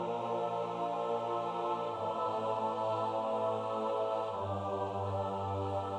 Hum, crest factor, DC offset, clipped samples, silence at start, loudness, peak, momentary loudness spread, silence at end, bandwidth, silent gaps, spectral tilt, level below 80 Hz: none; 12 dB; under 0.1%; under 0.1%; 0 s; -35 LUFS; -22 dBFS; 2 LU; 0 s; 11 kHz; none; -7 dB/octave; -78 dBFS